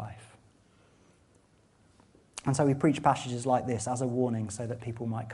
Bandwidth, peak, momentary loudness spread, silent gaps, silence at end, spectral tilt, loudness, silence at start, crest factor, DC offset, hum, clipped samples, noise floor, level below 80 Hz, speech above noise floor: 11.5 kHz; -10 dBFS; 11 LU; none; 0 s; -6 dB/octave; -30 LUFS; 0 s; 22 dB; under 0.1%; none; under 0.1%; -64 dBFS; -64 dBFS; 35 dB